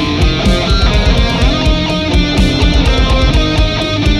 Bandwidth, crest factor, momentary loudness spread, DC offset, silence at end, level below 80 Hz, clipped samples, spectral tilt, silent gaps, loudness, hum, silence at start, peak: 11.5 kHz; 10 dB; 2 LU; under 0.1%; 0 s; -14 dBFS; under 0.1%; -5.5 dB/octave; none; -12 LUFS; none; 0 s; 0 dBFS